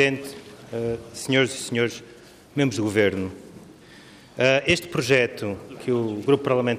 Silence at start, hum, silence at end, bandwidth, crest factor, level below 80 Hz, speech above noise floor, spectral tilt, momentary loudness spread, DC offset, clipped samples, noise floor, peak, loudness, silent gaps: 0 s; none; 0 s; 15.5 kHz; 18 dB; -58 dBFS; 24 dB; -5 dB/octave; 14 LU; under 0.1%; under 0.1%; -47 dBFS; -6 dBFS; -23 LUFS; none